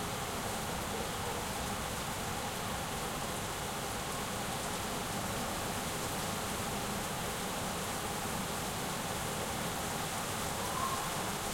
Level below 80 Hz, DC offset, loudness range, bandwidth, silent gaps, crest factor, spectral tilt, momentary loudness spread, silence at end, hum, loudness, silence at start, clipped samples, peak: -52 dBFS; under 0.1%; 1 LU; 16.5 kHz; none; 14 dB; -3 dB/octave; 1 LU; 0 s; none; -36 LUFS; 0 s; under 0.1%; -22 dBFS